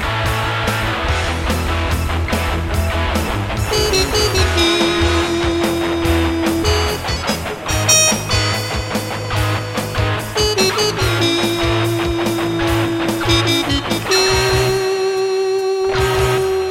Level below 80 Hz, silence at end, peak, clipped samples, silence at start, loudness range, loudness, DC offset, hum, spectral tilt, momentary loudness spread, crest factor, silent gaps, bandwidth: -26 dBFS; 0 s; 0 dBFS; under 0.1%; 0 s; 2 LU; -16 LUFS; under 0.1%; none; -4 dB/octave; 6 LU; 16 dB; none; 16.5 kHz